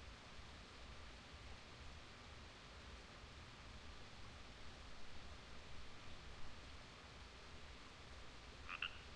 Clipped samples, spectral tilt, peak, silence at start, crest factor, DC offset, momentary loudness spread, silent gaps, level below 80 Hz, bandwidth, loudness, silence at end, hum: under 0.1%; -3.5 dB/octave; -28 dBFS; 0 s; 26 dB; under 0.1%; 1 LU; none; -62 dBFS; 10.5 kHz; -57 LUFS; 0 s; none